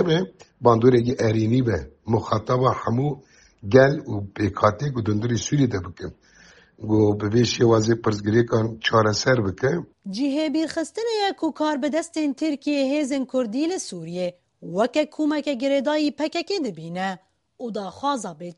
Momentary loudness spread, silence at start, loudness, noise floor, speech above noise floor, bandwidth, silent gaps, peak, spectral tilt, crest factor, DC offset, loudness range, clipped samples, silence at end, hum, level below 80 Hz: 12 LU; 0 s; -23 LUFS; -52 dBFS; 30 dB; 11.5 kHz; none; -2 dBFS; -6 dB/octave; 20 dB; under 0.1%; 4 LU; under 0.1%; 0.05 s; none; -52 dBFS